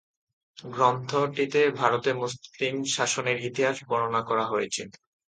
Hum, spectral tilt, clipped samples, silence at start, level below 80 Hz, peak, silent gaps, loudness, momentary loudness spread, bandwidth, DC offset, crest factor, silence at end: none; -3.5 dB/octave; under 0.1%; 0.65 s; -70 dBFS; -6 dBFS; none; -26 LUFS; 9 LU; 9.4 kHz; under 0.1%; 22 dB; 0.4 s